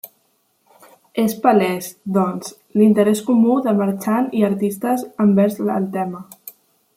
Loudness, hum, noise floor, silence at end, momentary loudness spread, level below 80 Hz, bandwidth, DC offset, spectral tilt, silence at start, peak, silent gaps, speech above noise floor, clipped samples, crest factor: -18 LUFS; none; -64 dBFS; 0.45 s; 13 LU; -66 dBFS; 16 kHz; under 0.1%; -7 dB/octave; 0.05 s; -2 dBFS; none; 46 dB; under 0.1%; 16 dB